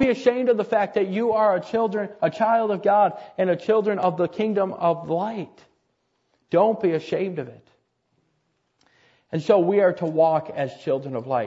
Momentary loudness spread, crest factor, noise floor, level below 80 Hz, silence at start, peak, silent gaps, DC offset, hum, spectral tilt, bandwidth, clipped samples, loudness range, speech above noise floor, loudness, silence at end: 9 LU; 18 dB; -71 dBFS; -62 dBFS; 0 s; -6 dBFS; none; under 0.1%; none; -7.5 dB/octave; 7.8 kHz; under 0.1%; 5 LU; 50 dB; -22 LUFS; 0 s